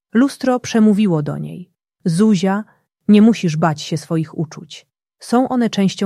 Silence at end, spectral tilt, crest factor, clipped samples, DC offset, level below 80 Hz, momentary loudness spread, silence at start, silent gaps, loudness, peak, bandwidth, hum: 0 s; -6.5 dB/octave; 14 dB; under 0.1%; under 0.1%; -60 dBFS; 15 LU; 0.15 s; none; -16 LUFS; -2 dBFS; 12 kHz; none